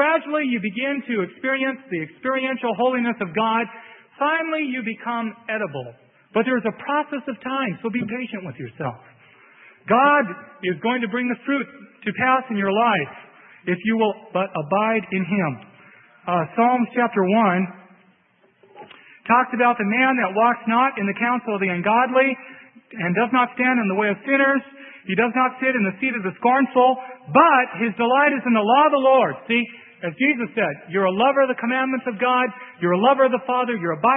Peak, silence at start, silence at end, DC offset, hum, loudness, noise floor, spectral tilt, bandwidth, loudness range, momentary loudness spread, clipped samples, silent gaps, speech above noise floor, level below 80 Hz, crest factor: -2 dBFS; 0 s; 0 s; under 0.1%; none; -21 LUFS; -60 dBFS; -10.5 dB/octave; 3.9 kHz; 7 LU; 12 LU; under 0.1%; none; 40 dB; -72 dBFS; 20 dB